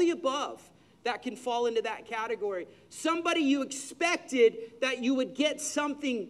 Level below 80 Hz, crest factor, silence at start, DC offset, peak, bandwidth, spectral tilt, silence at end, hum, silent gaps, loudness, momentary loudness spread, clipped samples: -76 dBFS; 18 dB; 0 s; under 0.1%; -12 dBFS; 13 kHz; -2.5 dB/octave; 0 s; none; none; -30 LUFS; 10 LU; under 0.1%